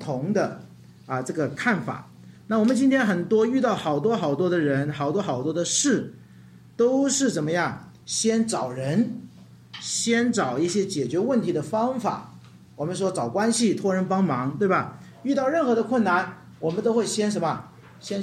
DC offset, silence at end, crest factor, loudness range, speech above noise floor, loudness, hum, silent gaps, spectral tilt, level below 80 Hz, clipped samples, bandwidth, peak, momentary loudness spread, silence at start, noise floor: under 0.1%; 0 s; 16 dB; 2 LU; 25 dB; -24 LUFS; none; none; -4.5 dB/octave; -68 dBFS; under 0.1%; 13.5 kHz; -10 dBFS; 11 LU; 0 s; -48 dBFS